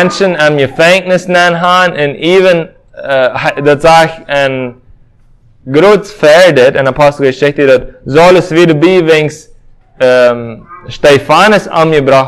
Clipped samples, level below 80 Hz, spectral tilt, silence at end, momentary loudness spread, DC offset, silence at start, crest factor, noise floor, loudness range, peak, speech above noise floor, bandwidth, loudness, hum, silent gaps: 3%; -40 dBFS; -5 dB/octave; 0 s; 8 LU; under 0.1%; 0 s; 8 dB; -42 dBFS; 3 LU; 0 dBFS; 35 dB; 16 kHz; -7 LUFS; none; none